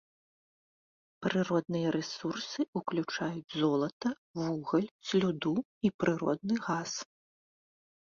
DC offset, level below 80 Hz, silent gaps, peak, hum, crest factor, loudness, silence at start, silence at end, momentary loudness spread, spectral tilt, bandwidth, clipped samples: under 0.1%; -70 dBFS; 2.68-2.73 s, 3.93-4.00 s, 4.18-4.34 s, 4.91-4.99 s, 5.65-5.81 s, 5.94-5.99 s; -16 dBFS; none; 18 dB; -33 LUFS; 1.2 s; 0.95 s; 6 LU; -5.5 dB/octave; 7.4 kHz; under 0.1%